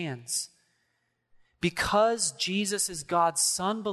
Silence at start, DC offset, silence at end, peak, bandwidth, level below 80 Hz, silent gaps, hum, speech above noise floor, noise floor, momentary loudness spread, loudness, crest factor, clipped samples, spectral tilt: 0 s; under 0.1%; 0 s; -12 dBFS; 12.5 kHz; -56 dBFS; none; none; 48 dB; -76 dBFS; 8 LU; -27 LUFS; 18 dB; under 0.1%; -2.5 dB/octave